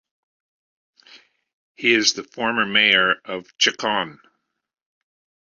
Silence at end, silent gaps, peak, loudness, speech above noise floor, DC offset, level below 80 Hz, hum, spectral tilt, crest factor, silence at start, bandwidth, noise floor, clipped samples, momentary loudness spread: 1.45 s; 1.53-1.75 s; -2 dBFS; -18 LUFS; 31 dB; under 0.1%; -66 dBFS; none; -1.5 dB/octave; 22 dB; 1.15 s; 7.6 kHz; -51 dBFS; under 0.1%; 10 LU